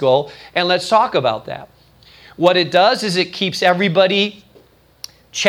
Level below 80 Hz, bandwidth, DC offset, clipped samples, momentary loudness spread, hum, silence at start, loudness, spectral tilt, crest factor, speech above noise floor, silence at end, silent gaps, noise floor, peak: -58 dBFS; 15.5 kHz; under 0.1%; under 0.1%; 17 LU; none; 0 s; -16 LUFS; -4 dB/octave; 18 dB; 34 dB; 0 s; none; -50 dBFS; 0 dBFS